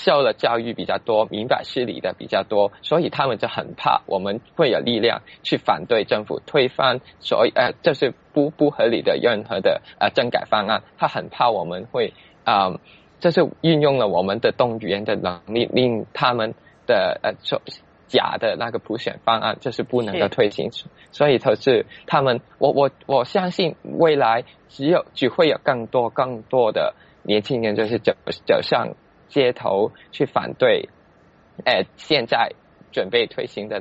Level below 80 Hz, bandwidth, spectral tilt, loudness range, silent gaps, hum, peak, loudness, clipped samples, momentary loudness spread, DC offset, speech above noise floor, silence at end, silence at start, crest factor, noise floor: -60 dBFS; 8 kHz; -3 dB/octave; 2 LU; none; none; -4 dBFS; -21 LUFS; under 0.1%; 8 LU; under 0.1%; 33 dB; 0 s; 0 s; 18 dB; -53 dBFS